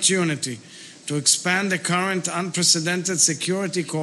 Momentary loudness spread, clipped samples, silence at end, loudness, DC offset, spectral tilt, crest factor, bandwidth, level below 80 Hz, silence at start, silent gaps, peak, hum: 12 LU; under 0.1%; 0 s; -20 LUFS; under 0.1%; -2.5 dB/octave; 18 dB; 12.5 kHz; -76 dBFS; 0 s; none; -4 dBFS; none